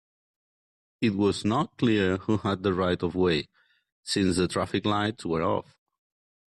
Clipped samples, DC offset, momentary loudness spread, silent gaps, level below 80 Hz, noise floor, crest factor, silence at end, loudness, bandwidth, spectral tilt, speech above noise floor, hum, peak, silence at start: under 0.1%; under 0.1%; 5 LU; 3.92-4.03 s; -58 dBFS; under -90 dBFS; 14 dB; 0.85 s; -27 LUFS; 12 kHz; -5.5 dB/octave; over 64 dB; none; -12 dBFS; 1 s